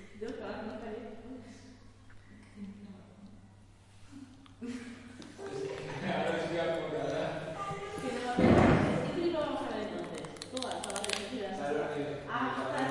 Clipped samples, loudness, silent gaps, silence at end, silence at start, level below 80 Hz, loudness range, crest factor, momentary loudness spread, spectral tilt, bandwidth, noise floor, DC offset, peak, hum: under 0.1%; -34 LUFS; none; 0 s; 0 s; -54 dBFS; 19 LU; 22 dB; 23 LU; -5.5 dB/octave; 11.5 kHz; -57 dBFS; under 0.1%; -12 dBFS; none